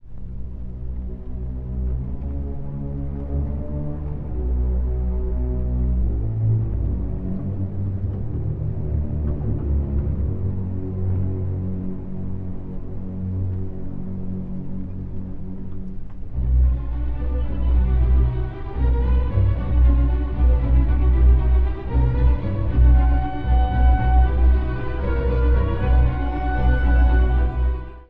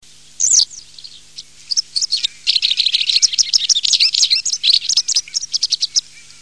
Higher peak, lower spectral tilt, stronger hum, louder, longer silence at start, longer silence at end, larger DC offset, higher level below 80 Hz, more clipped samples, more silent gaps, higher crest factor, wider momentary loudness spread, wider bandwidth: second, -6 dBFS vs 0 dBFS; first, -11 dB/octave vs 4.5 dB/octave; neither; second, -23 LUFS vs -13 LUFS; second, 0.05 s vs 0.4 s; second, 0.05 s vs 0.2 s; second, under 0.1% vs 0.6%; first, -20 dBFS vs -60 dBFS; neither; neither; about the same, 14 dB vs 16 dB; first, 14 LU vs 8 LU; second, 3.6 kHz vs 11 kHz